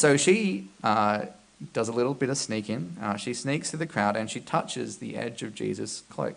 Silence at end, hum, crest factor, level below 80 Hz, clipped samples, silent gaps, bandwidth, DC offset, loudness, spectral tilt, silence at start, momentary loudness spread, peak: 0 s; none; 20 dB; -70 dBFS; under 0.1%; none; 10.5 kHz; under 0.1%; -28 LUFS; -4.5 dB/octave; 0 s; 10 LU; -8 dBFS